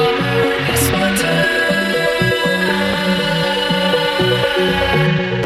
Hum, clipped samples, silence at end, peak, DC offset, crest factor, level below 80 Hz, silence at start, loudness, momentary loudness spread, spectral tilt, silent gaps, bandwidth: none; under 0.1%; 0 s; -2 dBFS; under 0.1%; 14 dB; -38 dBFS; 0 s; -15 LUFS; 2 LU; -4.5 dB/octave; none; 16 kHz